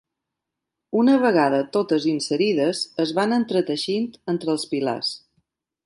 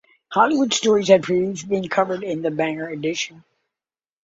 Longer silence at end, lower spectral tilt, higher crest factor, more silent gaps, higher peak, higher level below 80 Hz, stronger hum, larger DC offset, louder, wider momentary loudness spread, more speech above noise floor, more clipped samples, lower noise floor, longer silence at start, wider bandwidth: second, 0.7 s vs 0.85 s; about the same, -5 dB/octave vs -4 dB/octave; about the same, 16 dB vs 20 dB; neither; second, -6 dBFS vs 0 dBFS; second, -68 dBFS vs -62 dBFS; neither; neither; about the same, -22 LUFS vs -20 LUFS; about the same, 9 LU vs 9 LU; second, 62 dB vs over 70 dB; neither; second, -84 dBFS vs under -90 dBFS; first, 0.95 s vs 0.3 s; first, 11.5 kHz vs 8 kHz